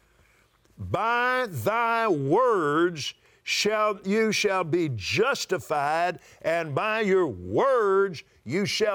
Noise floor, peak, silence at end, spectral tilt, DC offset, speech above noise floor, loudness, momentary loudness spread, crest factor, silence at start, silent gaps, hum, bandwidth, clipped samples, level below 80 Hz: -62 dBFS; -12 dBFS; 0 s; -4.5 dB/octave; under 0.1%; 37 dB; -25 LUFS; 7 LU; 14 dB; 0.8 s; none; none; over 20 kHz; under 0.1%; -66 dBFS